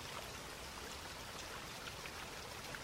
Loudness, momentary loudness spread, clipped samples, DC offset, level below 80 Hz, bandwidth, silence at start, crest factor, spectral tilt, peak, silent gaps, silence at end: -47 LUFS; 1 LU; under 0.1%; under 0.1%; -62 dBFS; 16 kHz; 0 s; 18 dB; -2.5 dB/octave; -32 dBFS; none; 0 s